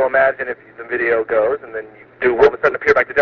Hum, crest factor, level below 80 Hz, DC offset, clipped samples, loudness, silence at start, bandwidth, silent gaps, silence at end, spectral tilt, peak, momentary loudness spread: none; 16 dB; -50 dBFS; under 0.1%; under 0.1%; -17 LUFS; 0 s; 6.6 kHz; none; 0 s; -2.5 dB/octave; 0 dBFS; 14 LU